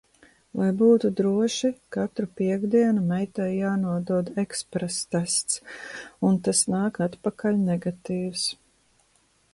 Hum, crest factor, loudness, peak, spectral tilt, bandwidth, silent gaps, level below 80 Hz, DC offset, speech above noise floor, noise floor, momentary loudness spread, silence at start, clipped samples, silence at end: none; 16 dB; -25 LUFS; -8 dBFS; -5 dB/octave; 11.5 kHz; none; -62 dBFS; under 0.1%; 40 dB; -65 dBFS; 9 LU; 0.55 s; under 0.1%; 1 s